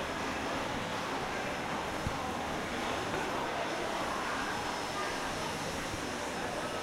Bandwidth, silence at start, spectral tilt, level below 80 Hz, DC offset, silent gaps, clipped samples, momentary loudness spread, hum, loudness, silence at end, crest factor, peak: 16 kHz; 0 s; -3.5 dB/octave; -54 dBFS; under 0.1%; none; under 0.1%; 2 LU; none; -35 LUFS; 0 s; 16 dB; -20 dBFS